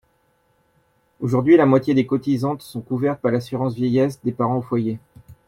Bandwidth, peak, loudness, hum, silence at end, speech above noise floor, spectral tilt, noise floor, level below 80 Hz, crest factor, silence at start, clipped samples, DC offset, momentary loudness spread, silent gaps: 15 kHz; -4 dBFS; -20 LUFS; none; 0.15 s; 44 dB; -8.5 dB/octave; -64 dBFS; -58 dBFS; 18 dB; 1.2 s; under 0.1%; under 0.1%; 13 LU; none